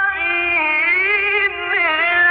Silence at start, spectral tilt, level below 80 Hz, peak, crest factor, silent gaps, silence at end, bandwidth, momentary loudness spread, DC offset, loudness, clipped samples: 0 s; -6 dB/octave; -50 dBFS; -6 dBFS; 12 dB; none; 0 s; 5.2 kHz; 3 LU; under 0.1%; -15 LUFS; under 0.1%